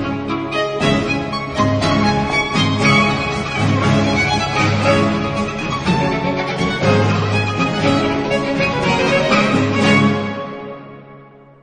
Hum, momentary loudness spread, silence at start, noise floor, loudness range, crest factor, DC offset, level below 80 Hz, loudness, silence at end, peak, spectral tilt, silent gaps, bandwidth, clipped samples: none; 7 LU; 0 s; -41 dBFS; 2 LU; 16 dB; under 0.1%; -38 dBFS; -16 LUFS; 0.4 s; -2 dBFS; -5.5 dB/octave; none; 10 kHz; under 0.1%